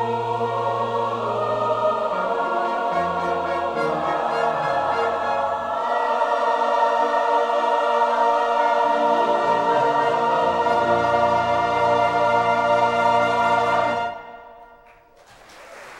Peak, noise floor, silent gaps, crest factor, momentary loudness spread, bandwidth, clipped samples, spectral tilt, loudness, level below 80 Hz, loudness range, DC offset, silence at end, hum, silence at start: -6 dBFS; -50 dBFS; none; 14 dB; 5 LU; 11.5 kHz; under 0.1%; -5 dB/octave; -20 LUFS; -58 dBFS; 4 LU; under 0.1%; 0 s; none; 0 s